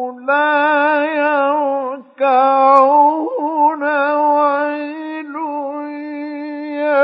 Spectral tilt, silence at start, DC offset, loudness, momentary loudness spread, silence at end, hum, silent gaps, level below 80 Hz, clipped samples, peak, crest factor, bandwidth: -5 dB/octave; 0 s; under 0.1%; -15 LUFS; 15 LU; 0 s; none; none; -84 dBFS; under 0.1%; 0 dBFS; 16 dB; 5.4 kHz